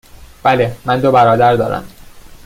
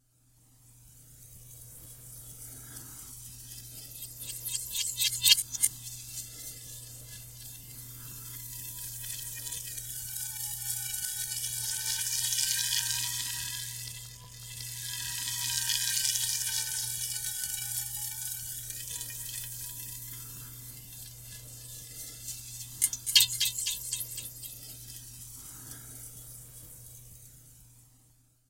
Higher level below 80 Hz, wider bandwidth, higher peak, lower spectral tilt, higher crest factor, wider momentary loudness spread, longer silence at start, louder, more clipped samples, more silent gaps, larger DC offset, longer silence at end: first, -42 dBFS vs -60 dBFS; about the same, 16 kHz vs 17 kHz; first, 0 dBFS vs -4 dBFS; first, -7 dB/octave vs 1 dB/octave; second, 14 dB vs 32 dB; second, 9 LU vs 18 LU; second, 0.2 s vs 0.55 s; first, -13 LUFS vs -31 LUFS; neither; neither; neither; second, 0.1 s vs 0.55 s